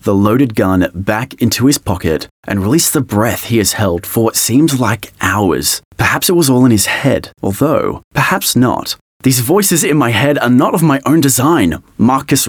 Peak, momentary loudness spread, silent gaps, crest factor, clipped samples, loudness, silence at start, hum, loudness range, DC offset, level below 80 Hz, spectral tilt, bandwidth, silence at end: 0 dBFS; 7 LU; 2.31-2.43 s, 5.85-5.91 s, 8.04-8.11 s, 9.01-9.20 s; 12 dB; under 0.1%; -12 LUFS; 0.05 s; none; 2 LU; under 0.1%; -42 dBFS; -4.5 dB/octave; 19.5 kHz; 0 s